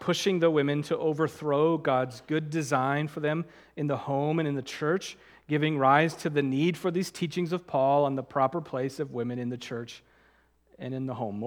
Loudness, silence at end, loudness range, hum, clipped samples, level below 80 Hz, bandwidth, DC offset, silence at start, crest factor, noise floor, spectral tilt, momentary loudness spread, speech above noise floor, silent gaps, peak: -28 LUFS; 0 s; 4 LU; none; under 0.1%; -70 dBFS; 17.5 kHz; under 0.1%; 0 s; 22 dB; -64 dBFS; -6 dB/octave; 10 LU; 36 dB; none; -8 dBFS